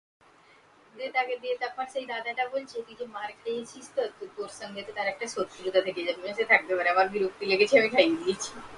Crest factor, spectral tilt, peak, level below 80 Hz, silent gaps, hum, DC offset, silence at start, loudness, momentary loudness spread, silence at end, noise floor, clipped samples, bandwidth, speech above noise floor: 22 dB; -3 dB/octave; -6 dBFS; -70 dBFS; none; none; under 0.1%; 0.95 s; -28 LUFS; 16 LU; 0 s; -58 dBFS; under 0.1%; 11.5 kHz; 30 dB